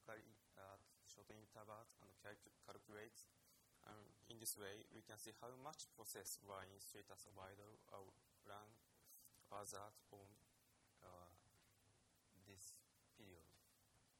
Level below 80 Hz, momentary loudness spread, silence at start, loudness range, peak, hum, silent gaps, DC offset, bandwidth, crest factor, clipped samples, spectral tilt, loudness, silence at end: -88 dBFS; 14 LU; 0 s; 12 LU; -34 dBFS; none; none; under 0.1%; 18 kHz; 28 dB; under 0.1%; -2.5 dB/octave; -59 LUFS; 0 s